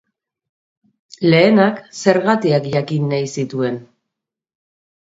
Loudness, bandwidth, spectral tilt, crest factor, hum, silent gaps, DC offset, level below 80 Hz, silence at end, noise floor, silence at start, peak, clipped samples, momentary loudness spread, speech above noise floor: -16 LUFS; 8 kHz; -6 dB/octave; 18 dB; none; none; under 0.1%; -62 dBFS; 1.2 s; -82 dBFS; 1.2 s; 0 dBFS; under 0.1%; 10 LU; 66 dB